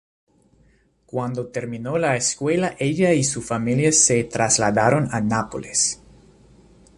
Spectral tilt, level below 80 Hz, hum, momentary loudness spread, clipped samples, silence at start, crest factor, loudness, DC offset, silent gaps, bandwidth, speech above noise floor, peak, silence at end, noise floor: -4 dB/octave; -52 dBFS; none; 12 LU; under 0.1%; 1.15 s; 18 dB; -20 LUFS; under 0.1%; none; 11.5 kHz; 38 dB; -4 dBFS; 1.05 s; -59 dBFS